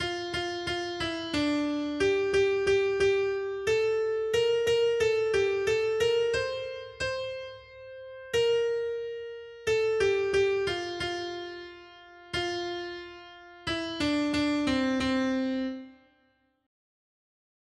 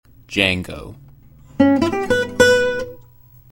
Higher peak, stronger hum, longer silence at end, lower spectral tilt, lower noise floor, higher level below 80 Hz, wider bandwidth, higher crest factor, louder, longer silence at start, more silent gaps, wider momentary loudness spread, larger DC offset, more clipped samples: second, -14 dBFS vs 0 dBFS; neither; first, 1.7 s vs 0.5 s; about the same, -4.5 dB/octave vs -4.5 dB/octave; first, -70 dBFS vs -47 dBFS; second, -56 dBFS vs -44 dBFS; second, 12.5 kHz vs 16.5 kHz; second, 14 dB vs 20 dB; second, -28 LUFS vs -17 LUFS; second, 0 s vs 0.3 s; neither; second, 15 LU vs 19 LU; neither; neither